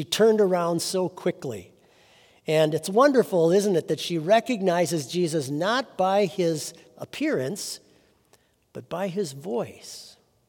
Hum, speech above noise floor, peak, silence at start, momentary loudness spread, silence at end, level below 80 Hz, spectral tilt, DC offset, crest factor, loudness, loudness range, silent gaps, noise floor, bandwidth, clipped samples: none; 39 dB; -6 dBFS; 0 s; 19 LU; 0.4 s; -74 dBFS; -5 dB/octave; under 0.1%; 18 dB; -24 LUFS; 9 LU; none; -63 dBFS; 18 kHz; under 0.1%